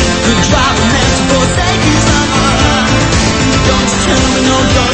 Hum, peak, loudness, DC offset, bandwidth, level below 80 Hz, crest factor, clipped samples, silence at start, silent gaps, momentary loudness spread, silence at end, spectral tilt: none; 0 dBFS; -9 LUFS; 0.2%; 8.8 kHz; -20 dBFS; 10 dB; under 0.1%; 0 s; none; 1 LU; 0 s; -4 dB/octave